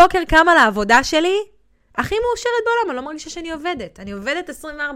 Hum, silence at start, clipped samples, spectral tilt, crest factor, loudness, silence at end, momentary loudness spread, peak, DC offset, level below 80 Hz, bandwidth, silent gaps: none; 0 s; under 0.1%; -3.5 dB/octave; 16 dB; -17 LUFS; 0 s; 17 LU; -2 dBFS; under 0.1%; -38 dBFS; 16.5 kHz; none